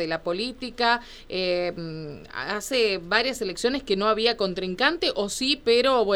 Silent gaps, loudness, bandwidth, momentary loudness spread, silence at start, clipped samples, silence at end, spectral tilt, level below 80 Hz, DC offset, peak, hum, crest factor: none; -24 LUFS; 17 kHz; 11 LU; 0 s; under 0.1%; 0 s; -3.5 dB/octave; -50 dBFS; under 0.1%; -4 dBFS; none; 20 dB